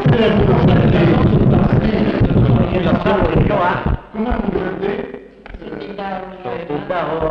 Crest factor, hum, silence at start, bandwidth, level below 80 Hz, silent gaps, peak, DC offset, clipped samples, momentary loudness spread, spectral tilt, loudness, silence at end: 14 dB; none; 0 s; 6 kHz; -26 dBFS; none; -2 dBFS; under 0.1%; under 0.1%; 14 LU; -9.5 dB/octave; -15 LUFS; 0 s